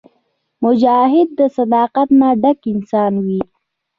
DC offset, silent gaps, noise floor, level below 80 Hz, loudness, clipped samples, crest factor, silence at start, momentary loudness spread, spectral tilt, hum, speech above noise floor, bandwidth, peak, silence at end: under 0.1%; none; -65 dBFS; -58 dBFS; -14 LUFS; under 0.1%; 12 dB; 0.6 s; 8 LU; -9 dB/octave; none; 51 dB; 5 kHz; -2 dBFS; 0.55 s